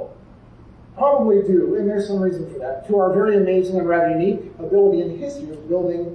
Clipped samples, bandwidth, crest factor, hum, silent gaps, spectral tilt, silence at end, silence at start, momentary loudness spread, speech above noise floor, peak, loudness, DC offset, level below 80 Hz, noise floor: under 0.1%; 9 kHz; 14 dB; none; none; -8.5 dB/octave; 0 s; 0 s; 12 LU; 26 dB; -6 dBFS; -19 LUFS; under 0.1%; -52 dBFS; -44 dBFS